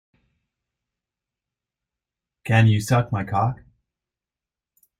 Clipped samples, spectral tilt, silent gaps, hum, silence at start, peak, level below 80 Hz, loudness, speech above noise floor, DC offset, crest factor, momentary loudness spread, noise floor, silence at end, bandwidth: under 0.1%; -6.5 dB/octave; none; none; 2.45 s; -4 dBFS; -54 dBFS; -21 LUFS; 70 dB; under 0.1%; 22 dB; 16 LU; -90 dBFS; 1.45 s; 14.5 kHz